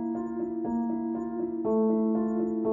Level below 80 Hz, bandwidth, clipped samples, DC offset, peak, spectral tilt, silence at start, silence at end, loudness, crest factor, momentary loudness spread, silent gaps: -62 dBFS; 2.1 kHz; under 0.1%; under 0.1%; -16 dBFS; -11.5 dB/octave; 0 s; 0 s; -29 LUFS; 12 dB; 7 LU; none